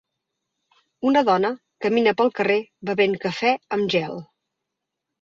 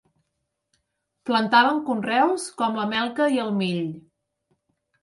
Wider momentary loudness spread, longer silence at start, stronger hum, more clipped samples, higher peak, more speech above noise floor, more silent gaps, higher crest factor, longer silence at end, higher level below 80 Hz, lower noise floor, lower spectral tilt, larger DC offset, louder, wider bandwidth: second, 8 LU vs 11 LU; second, 1 s vs 1.25 s; neither; neither; about the same, -6 dBFS vs -4 dBFS; first, 62 dB vs 56 dB; neither; about the same, 18 dB vs 22 dB; about the same, 1 s vs 1.05 s; first, -66 dBFS vs -72 dBFS; first, -82 dBFS vs -78 dBFS; first, -6 dB/octave vs -4.5 dB/octave; neither; about the same, -21 LUFS vs -22 LUFS; second, 7.4 kHz vs 11.5 kHz